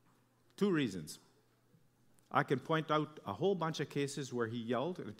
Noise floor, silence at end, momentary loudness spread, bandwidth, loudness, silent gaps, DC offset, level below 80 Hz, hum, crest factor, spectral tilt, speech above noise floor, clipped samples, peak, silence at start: -71 dBFS; 0.05 s; 7 LU; 16 kHz; -37 LUFS; none; under 0.1%; -80 dBFS; none; 22 dB; -5.5 dB/octave; 34 dB; under 0.1%; -16 dBFS; 0.6 s